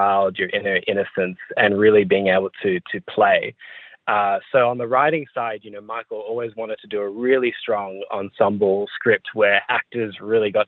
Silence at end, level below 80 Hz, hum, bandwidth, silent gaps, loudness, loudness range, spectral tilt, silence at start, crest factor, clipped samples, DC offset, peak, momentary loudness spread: 0.05 s; -66 dBFS; none; 4.2 kHz; none; -20 LUFS; 4 LU; -8.5 dB/octave; 0 s; 20 dB; under 0.1%; under 0.1%; -2 dBFS; 12 LU